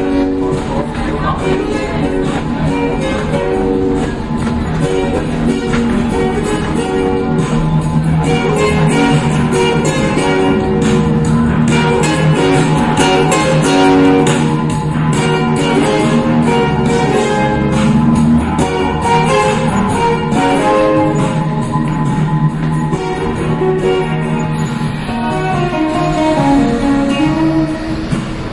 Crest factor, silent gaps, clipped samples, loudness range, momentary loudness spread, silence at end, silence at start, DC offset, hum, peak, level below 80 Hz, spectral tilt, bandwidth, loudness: 10 dB; none; under 0.1%; 4 LU; 5 LU; 0 s; 0 s; under 0.1%; none; -2 dBFS; -28 dBFS; -6 dB/octave; 11.5 kHz; -13 LUFS